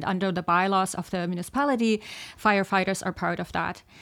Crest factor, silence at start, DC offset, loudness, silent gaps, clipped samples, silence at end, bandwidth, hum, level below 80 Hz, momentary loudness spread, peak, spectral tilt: 18 dB; 0 s; under 0.1%; -26 LUFS; none; under 0.1%; 0 s; 16 kHz; none; -56 dBFS; 8 LU; -8 dBFS; -5 dB/octave